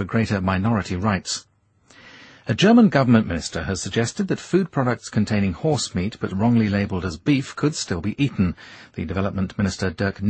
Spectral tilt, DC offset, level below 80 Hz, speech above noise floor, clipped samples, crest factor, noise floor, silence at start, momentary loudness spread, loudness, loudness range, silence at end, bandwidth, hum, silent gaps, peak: -6 dB/octave; under 0.1%; -46 dBFS; 35 dB; under 0.1%; 18 dB; -56 dBFS; 0 s; 10 LU; -22 LUFS; 3 LU; 0 s; 8.8 kHz; none; none; -4 dBFS